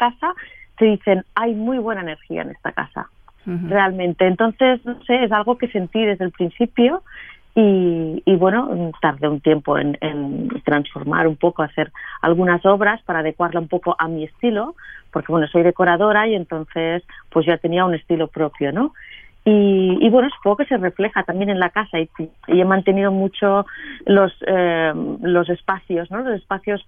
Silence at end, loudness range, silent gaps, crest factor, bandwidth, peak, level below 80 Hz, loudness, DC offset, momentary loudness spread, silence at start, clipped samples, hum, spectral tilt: 0.05 s; 3 LU; none; 16 dB; 3.7 kHz; -4 dBFS; -52 dBFS; -19 LUFS; under 0.1%; 11 LU; 0 s; under 0.1%; none; -10 dB/octave